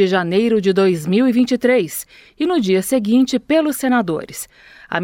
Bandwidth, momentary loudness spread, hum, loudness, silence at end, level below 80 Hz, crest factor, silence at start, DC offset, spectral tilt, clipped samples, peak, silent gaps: 17.5 kHz; 12 LU; none; -17 LUFS; 0 s; -56 dBFS; 16 dB; 0 s; under 0.1%; -5.5 dB/octave; under 0.1%; -2 dBFS; none